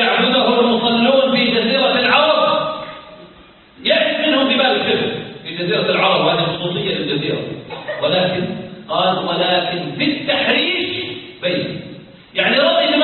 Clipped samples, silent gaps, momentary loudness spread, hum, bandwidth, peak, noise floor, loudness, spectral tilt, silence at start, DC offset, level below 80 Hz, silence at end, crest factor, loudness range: under 0.1%; none; 13 LU; none; 4.4 kHz; 0 dBFS; -44 dBFS; -16 LUFS; -10 dB/octave; 0 s; under 0.1%; -54 dBFS; 0 s; 16 dB; 4 LU